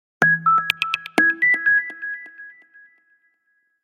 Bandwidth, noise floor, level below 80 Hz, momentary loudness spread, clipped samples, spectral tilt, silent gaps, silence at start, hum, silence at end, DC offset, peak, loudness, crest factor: 16 kHz; -68 dBFS; -70 dBFS; 15 LU; under 0.1%; -3.5 dB/octave; none; 0.2 s; none; 1.35 s; under 0.1%; 0 dBFS; -18 LUFS; 22 dB